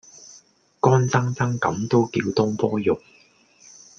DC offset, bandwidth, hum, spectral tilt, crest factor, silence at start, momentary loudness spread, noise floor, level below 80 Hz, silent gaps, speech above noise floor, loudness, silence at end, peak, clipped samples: under 0.1%; 7.2 kHz; none; -6.5 dB/octave; 20 dB; 0.2 s; 6 LU; -55 dBFS; -60 dBFS; none; 34 dB; -22 LUFS; 1 s; -2 dBFS; under 0.1%